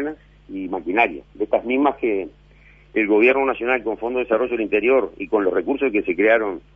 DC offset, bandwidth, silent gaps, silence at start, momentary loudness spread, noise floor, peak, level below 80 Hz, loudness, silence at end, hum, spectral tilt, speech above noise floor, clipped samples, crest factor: under 0.1%; 3.7 kHz; none; 0 s; 11 LU; -49 dBFS; -4 dBFS; -52 dBFS; -20 LUFS; 0.15 s; none; -7.5 dB/octave; 30 dB; under 0.1%; 16 dB